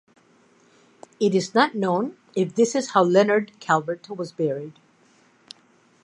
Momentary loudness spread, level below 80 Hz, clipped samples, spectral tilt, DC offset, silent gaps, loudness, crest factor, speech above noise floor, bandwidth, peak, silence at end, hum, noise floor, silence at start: 13 LU; -76 dBFS; under 0.1%; -5 dB/octave; under 0.1%; none; -22 LUFS; 20 dB; 37 dB; 11 kHz; -4 dBFS; 1.3 s; none; -59 dBFS; 1.2 s